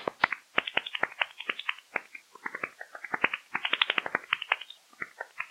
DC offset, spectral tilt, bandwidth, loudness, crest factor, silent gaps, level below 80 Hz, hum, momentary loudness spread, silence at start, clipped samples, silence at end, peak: under 0.1%; -2 dB/octave; 16 kHz; -31 LUFS; 26 dB; none; -78 dBFS; none; 14 LU; 0 s; under 0.1%; 0 s; -6 dBFS